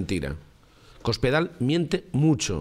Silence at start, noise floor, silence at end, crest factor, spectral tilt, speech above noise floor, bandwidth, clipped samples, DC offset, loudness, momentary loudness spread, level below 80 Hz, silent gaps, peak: 0 s; -53 dBFS; 0 s; 16 dB; -5.5 dB/octave; 28 dB; 13.5 kHz; under 0.1%; under 0.1%; -25 LUFS; 10 LU; -44 dBFS; none; -10 dBFS